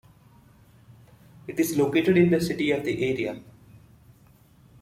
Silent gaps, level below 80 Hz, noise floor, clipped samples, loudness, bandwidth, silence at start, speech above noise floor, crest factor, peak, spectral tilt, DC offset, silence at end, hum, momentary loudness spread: none; -58 dBFS; -56 dBFS; under 0.1%; -24 LUFS; 16 kHz; 1.45 s; 33 dB; 20 dB; -8 dBFS; -6 dB/octave; under 0.1%; 1.3 s; none; 14 LU